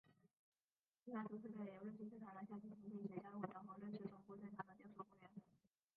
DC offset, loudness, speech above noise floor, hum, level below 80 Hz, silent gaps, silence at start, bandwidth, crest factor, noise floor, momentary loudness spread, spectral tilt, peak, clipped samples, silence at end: under 0.1%; -55 LUFS; over 37 dB; none; under -90 dBFS; 0.39-0.52 s, 0.64-0.68 s, 0.79-0.84 s; 0.05 s; 4.5 kHz; 22 dB; under -90 dBFS; 8 LU; -7.5 dB/octave; -34 dBFS; under 0.1%; 0.4 s